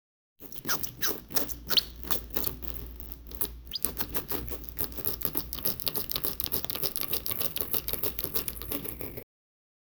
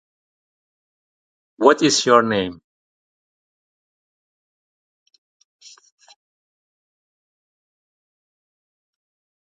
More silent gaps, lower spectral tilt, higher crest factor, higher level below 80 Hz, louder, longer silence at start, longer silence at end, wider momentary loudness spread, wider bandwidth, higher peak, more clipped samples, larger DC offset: neither; second, -2 dB/octave vs -3.5 dB/octave; first, 32 dB vs 26 dB; first, -48 dBFS vs -64 dBFS; second, -29 LUFS vs -17 LUFS; second, 0.4 s vs 1.6 s; second, 0.75 s vs 6.9 s; about the same, 10 LU vs 9 LU; first, over 20 kHz vs 9.6 kHz; about the same, 0 dBFS vs 0 dBFS; neither; neither